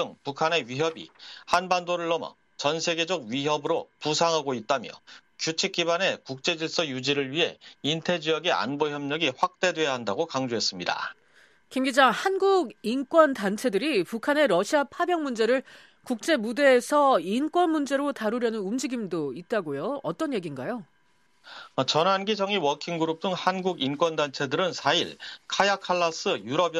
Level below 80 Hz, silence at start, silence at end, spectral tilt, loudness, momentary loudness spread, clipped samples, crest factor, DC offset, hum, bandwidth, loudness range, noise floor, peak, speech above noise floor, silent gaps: -74 dBFS; 0 s; 0 s; -3.5 dB/octave; -26 LUFS; 10 LU; under 0.1%; 22 dB; under 0.1%; none; 14.5 kHz; 4 LU; -68 dBFS; -4 dBFS; 42 dB; none